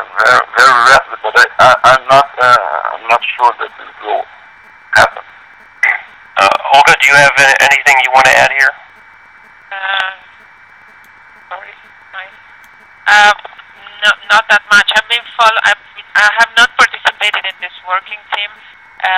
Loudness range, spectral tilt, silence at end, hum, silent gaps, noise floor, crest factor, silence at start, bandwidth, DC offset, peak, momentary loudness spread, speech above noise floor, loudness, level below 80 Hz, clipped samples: 11 LU; -1 dB/octave; 0 s; none; none; -40 dBFS; 12 dB; 0 s; 19 kHz; under 0.1%; 0 dBFS; 15 LU; 31 dB; -9 LUFS; -48 dBFS; 0.6%